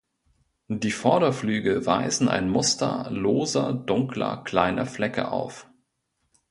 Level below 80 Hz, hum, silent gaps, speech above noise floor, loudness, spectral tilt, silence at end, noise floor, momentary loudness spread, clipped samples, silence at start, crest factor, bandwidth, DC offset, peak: -56 dBFS; none; none; 51 dB; -24 LUFS; -4.5 dB/octave; 0.9 s; -75 dBFS; 7 LU; under 0.1%; 0.7 s; 22 dB; 11.5 kHz; under 0.1%; -4 dBFS